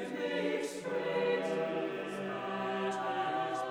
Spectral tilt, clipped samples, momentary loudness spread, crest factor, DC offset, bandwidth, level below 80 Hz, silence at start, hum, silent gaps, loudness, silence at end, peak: -5 dB/octave; under 0.1%; 5 LU; 14 dB; under 0.1%; over 20 kHz; -76 dBFS; 0 s; none; none; -35 LUFS; 0 s; -22 dBFS